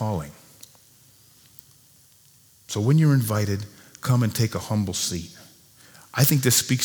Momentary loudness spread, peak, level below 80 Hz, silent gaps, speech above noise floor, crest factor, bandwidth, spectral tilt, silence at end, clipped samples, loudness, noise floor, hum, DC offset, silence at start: 14 LU; -4 dBFS; -56 dBFS; none; 34 dB; 20 dB; over 20 kHz; -4.5 dB/octave; 0 s; under 0.1%; -23 LUFS; -55 dBFS; none; under 0.1%; 0 s